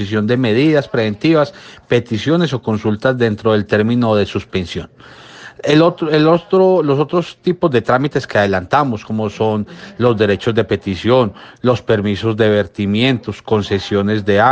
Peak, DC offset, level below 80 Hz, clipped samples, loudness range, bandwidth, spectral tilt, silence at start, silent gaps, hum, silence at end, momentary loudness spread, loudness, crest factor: 0 dBFS; under 0.1%; -50 dBFS; under 0.1%; 2 LU; 8.6 kHz; -7 dB/octave; 0 s; none; none; 0 s; 9 LU; -15 LUFS; 14 dB